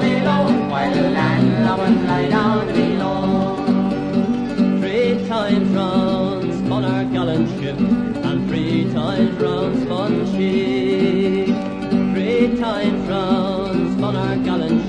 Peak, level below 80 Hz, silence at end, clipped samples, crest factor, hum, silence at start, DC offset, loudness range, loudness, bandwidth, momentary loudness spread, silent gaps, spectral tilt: -4 dBFS; -44 dBFS; 0 s; under 0.1%; 14 dB; none; 0 s; under 0.1%; 2 LU; -18 LUFS; 9.6 kHz; 4 LU; none; -7.5 dB/octave